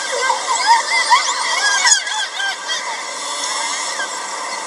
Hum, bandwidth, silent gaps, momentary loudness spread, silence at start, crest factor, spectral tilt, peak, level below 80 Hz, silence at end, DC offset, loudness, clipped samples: none; 15.5 kHz; none; 10 LU; 0 s; 18 dB; 3 dB/octave; 0 dBFS; -84 dBFS; 0 s; under 0.1%; -16 LUFS; under 0.1%